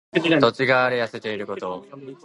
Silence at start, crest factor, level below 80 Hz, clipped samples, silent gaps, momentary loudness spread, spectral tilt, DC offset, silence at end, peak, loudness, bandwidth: 0.15 s; 20 dB; -64 dBFS; under 0.1%; none; 15 LU; -6 dB/octave; under 0.1%; 0.1 s; -2 dBFS; -21 LUFS; 11 kHz